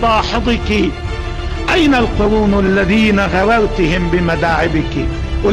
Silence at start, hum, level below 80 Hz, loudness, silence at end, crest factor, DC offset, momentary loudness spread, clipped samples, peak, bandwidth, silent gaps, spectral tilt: 0 s; none; -22 dBFS; -14 LUFS; 0 s; 8 dB; under 0.1%; 8 LU; under 0.1%; -6 dBFS; 11.5 kHz; none; -6 dB/octave